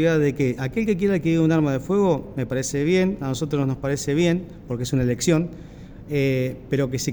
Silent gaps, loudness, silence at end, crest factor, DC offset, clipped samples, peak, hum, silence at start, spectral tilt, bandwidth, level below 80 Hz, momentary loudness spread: none; -22 LUFS; 0 s; 16 dB; under 0.1%; under 0.1%; -6 dBFS; none; 0 s; -6 dB/octave; over 20 kHz; -46 dBFS; 8 LU